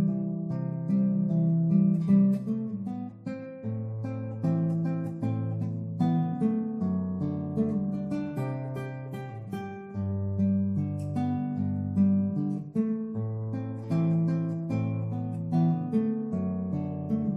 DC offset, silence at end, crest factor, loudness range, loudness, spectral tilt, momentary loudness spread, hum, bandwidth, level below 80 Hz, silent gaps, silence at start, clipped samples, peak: under 0.1%; 0 s; 16 dB; 5 LU; -29 LUFS; -10.5 dB/octave; 11 LU; none; 4.5 kHz; -66 dBFS; none; 0 s; under 0.1%; -12 dBFS